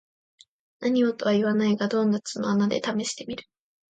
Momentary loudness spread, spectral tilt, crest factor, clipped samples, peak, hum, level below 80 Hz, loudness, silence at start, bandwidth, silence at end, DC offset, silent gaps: 9 LU; -5.5 dB/octave; 14 dB; under 0.1%; -12 dBFS; none; -68 dBFS; -25 LUFS; 0.8 s; 9.2 kHz; 0.55 s; under 0.1%; none